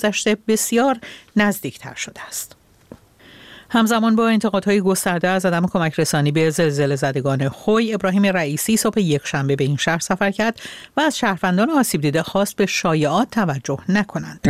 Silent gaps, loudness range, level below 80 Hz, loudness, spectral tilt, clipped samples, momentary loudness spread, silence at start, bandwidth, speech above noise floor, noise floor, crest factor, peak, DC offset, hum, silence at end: none; 4 LU; -52 dBFS; -19 LUFS; -5 dB/octave; under 0.1%; 9 LU; 0 s; 16 kHz; 28 dB; -46 dBFS; 16 dB; -4 dBFS; 0.2%; none; 0 s